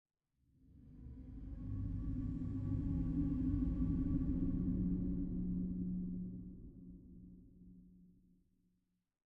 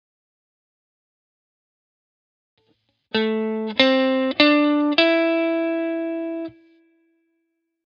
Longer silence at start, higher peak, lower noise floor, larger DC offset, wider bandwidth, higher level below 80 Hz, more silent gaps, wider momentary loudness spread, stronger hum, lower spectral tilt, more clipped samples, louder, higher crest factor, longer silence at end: second, 0.7 s vs 3.15 s; second, -26 dBFS vs 0 dBFS; first, -84 dBFS vs -74 dBFS; neither; second, 2.8 kHz vs 7 kHz; first, -48 dBFS vs -70 dBFS; neither; first, 20 LU vs 11 LU; neither; first, -12 dB/octave vs -5.5 dB/octave; neither; second, -40 LUFS vs -20 LUFS; second, 16 dB vs 24 dB; second, 1.2 s vs 1.35 s